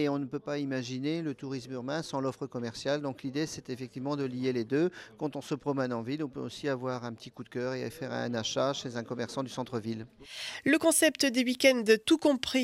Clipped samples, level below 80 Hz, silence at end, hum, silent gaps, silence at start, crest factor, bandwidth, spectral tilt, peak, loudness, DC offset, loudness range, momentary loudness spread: under 0.1%; -70 dBFS; 0 s; none; none; 0 s; 20 dB; 16 kHz; -4 dB/octave; -10 dBFS; -31 LUFS; under 0.1%; 7 LU; 13 LU